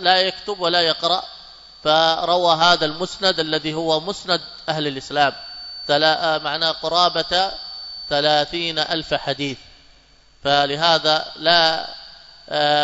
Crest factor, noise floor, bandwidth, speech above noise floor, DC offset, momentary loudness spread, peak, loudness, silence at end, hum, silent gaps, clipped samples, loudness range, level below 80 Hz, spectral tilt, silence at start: 20 dB; -52 dBFS; 8 kHz; 33 dB; under 0.1%; 12 LU; -2 dBFS; -19 LUFS; 0 s; none; none; under 0.1%; 3 LU; -52 dBFS; -3.5 dB/octave; 0 s